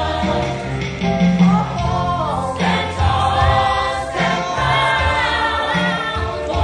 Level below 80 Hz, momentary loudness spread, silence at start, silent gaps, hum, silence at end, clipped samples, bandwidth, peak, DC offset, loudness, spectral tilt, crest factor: -30 dBFS; 6 LU; 0 s; none; none; 0 s; under 0.1%; 10 kHz; -4 dBFS; under 0.1%; -17 LUFS; -5.5 dB/octave; 14 dB